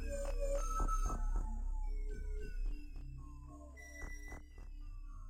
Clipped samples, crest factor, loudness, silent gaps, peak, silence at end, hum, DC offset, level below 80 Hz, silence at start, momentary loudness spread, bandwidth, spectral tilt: under 0.1%; 14 dB; -45 LUFS; none; -26 dBFS; 0 s; none; under 0.1%; -40 dBFS; 0 s; 15 LU; 9.6 kHz; -5.5 dB/octave